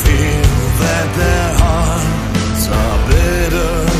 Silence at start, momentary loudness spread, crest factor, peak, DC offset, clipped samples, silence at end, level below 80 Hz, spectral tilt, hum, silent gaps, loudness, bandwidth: 0 s; 3 LU; 12 dB; 0 dBFS; under 0.1%; under 0.1%; 0 s; -16 dBFS; -5 dB/octave; none; none; -14 LUFS; 15.5 kHz